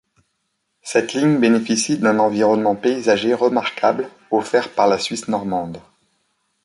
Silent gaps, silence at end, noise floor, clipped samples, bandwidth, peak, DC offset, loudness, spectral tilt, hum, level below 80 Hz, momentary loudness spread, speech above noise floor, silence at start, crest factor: none; 0.85 s; -72 dBFS; under 0.1%; 11.5 kHz; -2 dBFS; under 0.1%; -18 LUFS; -4.5 dB/octave; none; -60 dBFS; 8 LU; 54 dB; 0.85 s; 16 dB